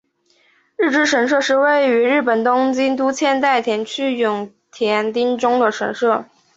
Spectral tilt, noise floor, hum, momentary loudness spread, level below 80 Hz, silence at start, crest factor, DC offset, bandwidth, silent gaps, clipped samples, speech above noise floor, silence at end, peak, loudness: -3.5 dB/octave; -59 dBFS; none; 7 LU; -66 dBFS; 0.8 s; 14 dB; under 0.1%; 8 kHz; none; under 0.1%; 42 dB; 0.35 s; -4 dBFS; -17 LUFS